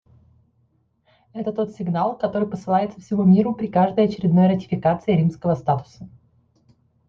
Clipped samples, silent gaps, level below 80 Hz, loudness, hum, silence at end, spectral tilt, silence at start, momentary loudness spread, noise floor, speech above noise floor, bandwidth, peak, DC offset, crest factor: under 0.1%; none; -56 dBFS; -21 LUFS; none; 1 s; -9.5 dB/octave; 1.35 s; 9 LU; -64 dBFS; 44 dB; 6.6 kHz; -4 dBFS; under 0.1%; 16 dB